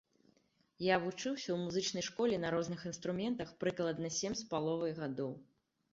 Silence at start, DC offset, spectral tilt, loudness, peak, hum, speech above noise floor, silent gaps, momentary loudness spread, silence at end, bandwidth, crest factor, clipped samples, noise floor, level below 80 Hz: 0.8 s; under 0.1%; -4.5 dB/octave; -38 LUFS; -18 dBFS; none; 37 dB; none; 7 LU; 0.5 s; 7.6 kHz; 20 dB; under 0.1%; -74 dBFS; -70 dBFS